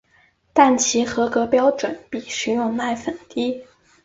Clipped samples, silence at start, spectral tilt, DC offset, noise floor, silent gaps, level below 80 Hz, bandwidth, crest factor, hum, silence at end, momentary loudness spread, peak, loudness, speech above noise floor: under 0.1%; 0.55 s; -3 dB/octave; under 0.1%; -59 dBFS; none; -58 dBFS; 8 kHz; 20 dB; none; 0.4 s; 12 LU; 0 dBFS; -20 LUFS; 39 dB